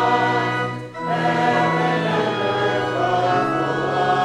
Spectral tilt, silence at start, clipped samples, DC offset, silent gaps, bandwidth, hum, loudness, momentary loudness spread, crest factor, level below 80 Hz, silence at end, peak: -6 dB/octave; 0 s; under 0.1%; under 0.1%; none; 11.5 kHz; none; -20 LUFS; 5 LU; 16 dB; -58 dBFS; 0 s; -4 dBFS